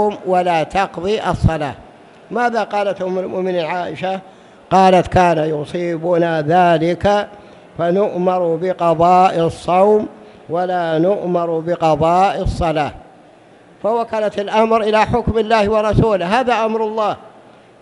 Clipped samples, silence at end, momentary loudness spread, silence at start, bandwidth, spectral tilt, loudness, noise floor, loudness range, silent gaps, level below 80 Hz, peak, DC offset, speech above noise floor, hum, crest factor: under 0.1%; 0.55 s; 9 LU; 0 s; 11.5 kHz; -6.5 dB/octave; -16 LUFS; -45 dBFS; 4 LU; none; -36 dBFS; 0 dBFS; under 0.1%; 30 dB; none; 16 dB